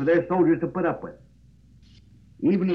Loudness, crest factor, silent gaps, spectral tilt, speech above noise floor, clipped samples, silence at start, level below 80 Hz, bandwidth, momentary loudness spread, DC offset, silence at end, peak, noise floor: -24 LUFS; 14 dB; none; -10 dB/octave; 32 dB; under 0.1%; 0 s; -56 dBFS; 5.4 kHz; 12 LU; under 0.1%; 0 s; -10 dBFS; -54 dBFS